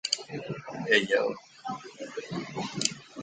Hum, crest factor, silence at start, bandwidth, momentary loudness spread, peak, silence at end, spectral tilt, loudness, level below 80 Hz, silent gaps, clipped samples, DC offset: none; 26 dB; 0.05 s; 9.6 kHz; 16 LU; -6 dBFS; 0 s; -2.5 dB/octave; -30 LUFS; -70 dBFS; none; under 0.1%; under 0.1%